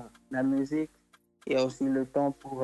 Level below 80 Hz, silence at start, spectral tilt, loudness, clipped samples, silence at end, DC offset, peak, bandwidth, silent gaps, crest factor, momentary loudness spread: -66 dBFS; 0 s; -6.5 dB/octave; -30 LUFS; under 0.1%; 0 s; under 0.1%; -16 dBFS; 11.5 kHz; none; 16 dB; 8 LU